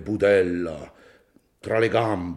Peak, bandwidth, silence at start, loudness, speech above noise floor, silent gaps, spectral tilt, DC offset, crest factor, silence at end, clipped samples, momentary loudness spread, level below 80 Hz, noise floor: -8 dBFS; 11.5 kHz; 0 s; -22 LUFS; 37 dB; none; -7 dB/octave; under 0.1%; 16 dB; 0 s; under 0.1%; 17 LU; -56 dBFS; -59 dBFS